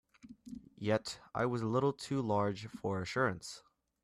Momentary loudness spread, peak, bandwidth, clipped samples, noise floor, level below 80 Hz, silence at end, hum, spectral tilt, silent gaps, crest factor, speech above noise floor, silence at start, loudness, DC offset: 18 LU; -20 dBFS; 13.5 kHz; under 0.1%; -54 dBFS; -68 dBFS; 0.45 s; none; -6 dB/octave; none; 18 dB; 19 dB; 0.25 s; -36 LUFS; under 0.1%